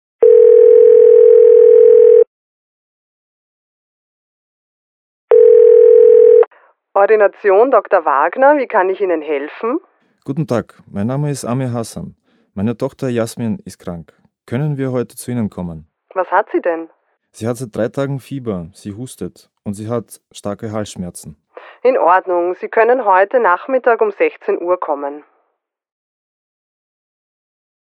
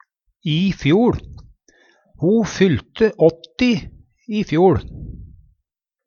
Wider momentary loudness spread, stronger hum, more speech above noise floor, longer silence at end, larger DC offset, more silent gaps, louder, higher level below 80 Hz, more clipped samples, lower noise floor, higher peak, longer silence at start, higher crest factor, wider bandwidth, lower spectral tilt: first, 21 LU vs 13 LU; neither; second, 53 dB vs 61 dB; first, 2.75 s vs 0.8 s; neither; first, 2.27-5.28 s vs none; first, -12 LUFS vs -18 LUFS; second, -56 dBFS vs -42 dBFS; neither; second, -70 dBFS vs -78 dBFS; about the same, 0 dBFS vs -2 dBFS; second, 0.2 s vs 0.45 s; about the same, 14 dB vs 18 dB; first, 12 kHz vs 7.2 kHz; about the same, -7 dB/octave vs -7 dB/octave